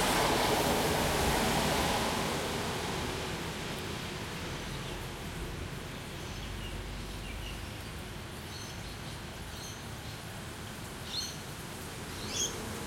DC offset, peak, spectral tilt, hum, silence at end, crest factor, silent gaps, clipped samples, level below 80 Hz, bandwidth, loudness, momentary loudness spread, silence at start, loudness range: under 0.1%; -16 dBFS; -3.5 dB/octave; none; 0 s; 18 dB; none; under 0.1%; -46 dBFS; 16.5 kHz; -35 LUFS; 13 LU; 0 s; 11 LU